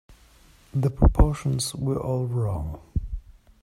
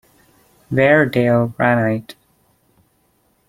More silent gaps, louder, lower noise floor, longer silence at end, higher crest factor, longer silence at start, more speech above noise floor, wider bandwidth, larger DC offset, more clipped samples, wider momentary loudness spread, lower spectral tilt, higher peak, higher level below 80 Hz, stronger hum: neither; second, -26 LUFS vs -16 LUFS; second, -54 dBFS vs -61 dBFS; second, 0.4 s vs 1.35 s; about the same, 20 dB vs 18 dB; second, 0.1 s vs 0.7 s; second, 32 dB vs 46 dB; about the same, 15.5 kHz vs 15.5 kHz; neither; neither; first, 12 LU vs 9 LU; second, -6.5 dB/octave vs -8 dB/octave; about the same, -4 dBFS vs -2 dBFS; first, -28 dBFS vs -54 dBFS; neither